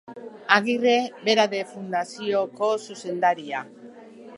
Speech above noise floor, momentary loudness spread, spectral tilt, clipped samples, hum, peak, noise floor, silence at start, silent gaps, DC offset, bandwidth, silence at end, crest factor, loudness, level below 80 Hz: 21 dB; 12 LU; -3.5 dB/octave; under 0.1%; none; 0 dBFS; -44 dBFS; 0.1 s; none; under 0.1%; 11.5 kHz; 0 s; 24 dB; -24 LUFS; -80 dBFS